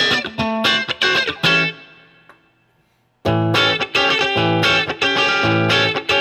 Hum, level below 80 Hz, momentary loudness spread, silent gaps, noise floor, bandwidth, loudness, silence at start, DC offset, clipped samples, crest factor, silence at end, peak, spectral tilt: none; -52 dBFS; 4 LU; none; -61 dBFS; 16 kHz; -16 LUFS; 0 s; under 0.1%; under 0.1%; 16 dB; 0 s; -2 dBFS; -4 dB/octave